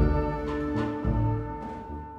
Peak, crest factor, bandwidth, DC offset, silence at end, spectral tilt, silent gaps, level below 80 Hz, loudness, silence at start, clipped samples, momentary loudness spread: -10 dBFS; 18 dB; 7.2 kHz; under 0.1%; 0 s; -9.5 dB/octave; none; -34 dBFS; -30 LUFS; 0 s; under 0.1%; 10 LU